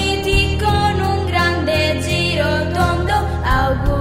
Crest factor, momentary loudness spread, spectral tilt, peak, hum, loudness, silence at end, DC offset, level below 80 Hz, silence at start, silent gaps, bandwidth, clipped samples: 14 dB; 2 LU; -5.5 dB/octave; -2 dBFS; none; -17 LUFS; 0 s; 0.6%; -24 dBFS; 0 s; none; 16 kHz; under 0.1%